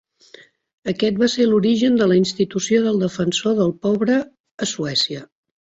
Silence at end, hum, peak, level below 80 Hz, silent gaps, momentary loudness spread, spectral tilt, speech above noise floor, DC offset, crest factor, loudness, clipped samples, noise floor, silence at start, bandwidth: 0.4 s; none; -4 dBFS; -58 dBFS; 4.40-4.44 s, 4.51-4.58 s; 10 LU; -5 dB/octave; 30 dB; under 0.1%; 14 dB; -19 LUFS; under 0.1%; -48 dBFS; 0.85 s; 8 kHz